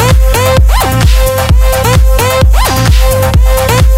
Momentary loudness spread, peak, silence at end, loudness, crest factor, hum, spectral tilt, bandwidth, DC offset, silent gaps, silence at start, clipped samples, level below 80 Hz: 1 LU; 0 dBFS; 0 s; -8 LUFS; 6 dB; none; -5 dB/octave; 16.5 kHz; under 0.1%; none; 0 s; 1%; -8 dBFS